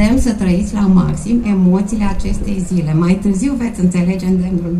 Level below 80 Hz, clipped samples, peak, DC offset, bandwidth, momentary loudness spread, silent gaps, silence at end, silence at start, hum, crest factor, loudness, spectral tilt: -26 dBFS; under 0.1%; 0 dBFS; under 0.1%; 11.5 kHz; 5 LU; none; 0 s; 0 s; none; 12 dB; -15 LUFS; -7.5 dB/octave